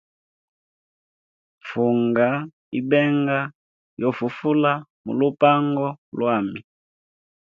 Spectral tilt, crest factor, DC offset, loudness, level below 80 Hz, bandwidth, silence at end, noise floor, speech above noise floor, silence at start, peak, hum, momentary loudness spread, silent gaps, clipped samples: -9 dB/octave; 20 dB; under 0.1%; -22 LUFS; -68 dBFS; 5.4 kHz; 1 s; under -90 dBFS; over 69 dB; 1.65 s; -2 dBFS; none; 12 LU; 2.53-2.72 s, 3.55-3.97 s, 4.90-5.04 s, 5.98-6.12 s; under 0.1%